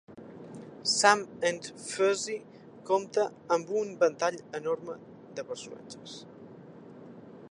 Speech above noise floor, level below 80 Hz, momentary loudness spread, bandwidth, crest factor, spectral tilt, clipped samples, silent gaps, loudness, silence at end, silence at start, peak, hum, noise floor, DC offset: 19 dB; -78 dBFS; 24 LU; 11.5 kHz; 26 dB; -2.5 dB/octave; under 0.1%; none; -29 LUFS; 0 s; 0.1 s; -6 dBFS; none; -49 dBFS; under 0.1%